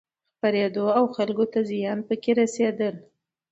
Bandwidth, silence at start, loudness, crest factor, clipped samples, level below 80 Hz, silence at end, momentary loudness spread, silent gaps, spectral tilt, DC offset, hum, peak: 8.2 kHz; 0.45 s; -24 LUFS; 18 dB; under 0.1%; -74 dBFS; 0.5 s; 6 LU; none; -5.5 dB/octave; under 0.1%; none; -8 dBFS